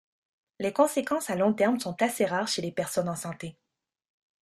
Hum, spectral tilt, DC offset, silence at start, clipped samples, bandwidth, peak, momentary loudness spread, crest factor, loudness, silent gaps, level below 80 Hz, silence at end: none; -4.5 dB/octave; under 0.1%; 0.6 s; under 0.1%; 14.5 kHz; -10 dBFS; 10 LU; 20 dB; -28 LUFS; none; -70 dBFS; 0.9 s